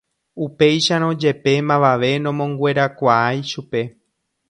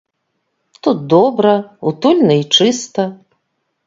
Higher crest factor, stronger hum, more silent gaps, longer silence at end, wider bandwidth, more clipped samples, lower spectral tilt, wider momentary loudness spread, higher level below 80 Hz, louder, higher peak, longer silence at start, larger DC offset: about the same, 18 dB vs 16 dB; neither; neither; about the same, 0.6 s vs 0.7 s; first, 10.5 kHz vs 7.8 kHz; neither; about the same, -5.5 dB/octave vs -5 dB/octave; about the same, 10 LU vs 10 LU; about the same, -60 dBFS vs -62 dBFS; second, -18 LUFS vs -14 LUFS; about the same, 0 dBFS vs 0 dBFS; second, 0.35 s vs 0.85 s; neither